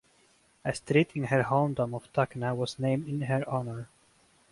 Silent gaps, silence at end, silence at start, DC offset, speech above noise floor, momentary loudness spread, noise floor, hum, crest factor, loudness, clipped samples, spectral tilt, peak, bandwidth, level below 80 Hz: none; 0.65 s; 0.65 s; under 0.1%; 36 dB; 10 LU; -65 dBFS; none; 20 dB; -30 LUFS; under 0.1%; -7 dB/octave; -10 dBFS; 11.5 kHz; -64 dBFS